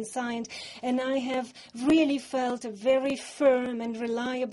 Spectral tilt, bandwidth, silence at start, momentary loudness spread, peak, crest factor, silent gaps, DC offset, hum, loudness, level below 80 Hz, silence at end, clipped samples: -4 dB/octave; 11.5 kHz; 0 s; 9 LU; -12 dBFS; 16 dB; none; under 0.1%; none; -28 LUFS; -64 dBFS; 0 s; under 0.1%